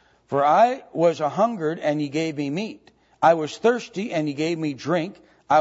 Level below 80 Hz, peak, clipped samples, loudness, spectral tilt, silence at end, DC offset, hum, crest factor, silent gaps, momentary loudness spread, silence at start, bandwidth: -70 dBFS; -4 dBFS; under 0.1%; -23 LUFS; -6 dB/octave; 0 s; under 0.1%; none; 18 dB; none; 9 LU; 0.3 s; 8 kHz